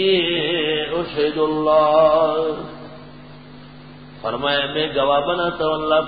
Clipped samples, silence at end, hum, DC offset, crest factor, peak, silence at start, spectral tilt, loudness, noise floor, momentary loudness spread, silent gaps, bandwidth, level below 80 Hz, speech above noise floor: under 0.1%; 0 s; none; 0.4%; 16 dB; -4 dBFS; 0 s; -10 dB/octave; -19 LUFS; -40 dBFS; 15 LU; none; 5 kHz; -50 dBFS; 22 dB